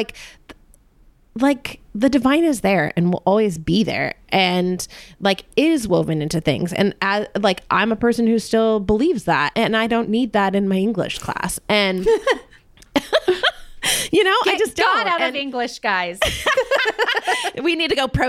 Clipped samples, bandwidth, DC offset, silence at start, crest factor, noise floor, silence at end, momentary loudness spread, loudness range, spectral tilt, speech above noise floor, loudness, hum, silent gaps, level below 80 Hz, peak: under 0.1%; 16.5 kHz; under 0.1%; 0 s; 16 dB; -52 dBFS; 0 s; 7 LU; 2 LU; -4.5 dB/octave; 34 dB; -19 LUFS; none; none; -44 dBFS; -4 dBFS